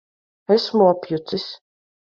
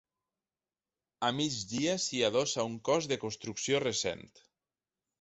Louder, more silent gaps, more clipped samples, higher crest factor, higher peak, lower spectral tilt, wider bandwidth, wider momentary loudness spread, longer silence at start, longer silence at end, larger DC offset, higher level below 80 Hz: first, -20 LUFS vs -32 LUFS; neither; neither; about the same, 18 dB vs 18 dB; first, -4 dBFS vs -16 dBFS; first, -7 dB/octave vs -3 dB/octave; second, 7.2 kHz vs 8.4 kHz; first, 20 LU vs 7 LU; second, 0.5 s vs 1.2 s; second, 0.6 s vs 0.95 s; neither; about the same, -68 dBFS vs -68 dBFS